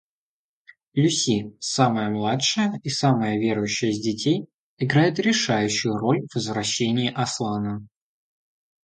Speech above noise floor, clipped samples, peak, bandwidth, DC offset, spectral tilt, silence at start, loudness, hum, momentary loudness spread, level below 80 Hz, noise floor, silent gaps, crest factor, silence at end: over 67 dB; under 0.1%; -4 dBFS; 9.4 kHz; under 0.1%; -4.5 dB/octave; 0.95 s; -23 LUFS; none; 7 LU; -60 dBFS; under -90 dBFS; 4.54-4.77 s; 20 dB; 1 s